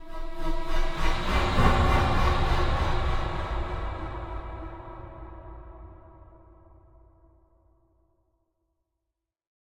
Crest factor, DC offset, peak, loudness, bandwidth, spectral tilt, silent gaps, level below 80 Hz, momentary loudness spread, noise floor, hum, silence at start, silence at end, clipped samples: 20 dB; under 0.1%; -6 dBFS; -28 LUFS; 10.5 kHz; -6 dB/octave; none; -30 dBFS; 21 LU; -85 dBFS; none; 0 s; 3.7 s; under 0.1%